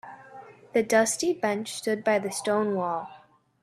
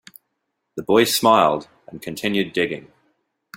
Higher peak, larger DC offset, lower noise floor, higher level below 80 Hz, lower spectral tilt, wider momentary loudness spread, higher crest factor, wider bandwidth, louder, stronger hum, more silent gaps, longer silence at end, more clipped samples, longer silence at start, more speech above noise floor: second, -8 dBFS vs -2 dBFS; neither; second, -48 dBFS vs -76 dBFS; second, -72 dBFS vs -60 dBFS; about the same, -3.5 dB/octave vs -3.5 dB/octave; about the same, 22 LU vs 20 LU; about the same, 20 dB vs 20 dB; second, 14.5 kHz vs 16.5 kHz; second, -26 LUFS vs -19 LUFS; neither; neither; second, 0.45 s vs 0.75 s; neither; second, 0.05 s vs 0.75 s; second, 22 dB vs 57 dB